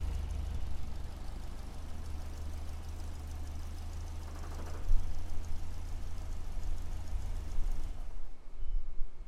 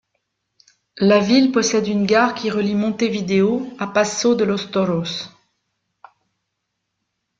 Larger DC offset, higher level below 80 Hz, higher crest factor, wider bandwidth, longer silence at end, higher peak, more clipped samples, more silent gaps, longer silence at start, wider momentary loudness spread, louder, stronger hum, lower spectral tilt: neither; first, -36 dBFS vs -60 dBFS; about the same, 18 dB vs 18 dB; first, 10.5 kHz vs 7.8 kHz; second, 0 s vs 2.1 s; second, -14 dBFS vs -2 dBFS; neither; neither; second, 0 s vs 0.95 s; about the same, 7 LU vs 8 LU; second, -44 LUFS vs -18 LUFS; neither; about the same, -5.5 dB/octave vs -5 dB/octave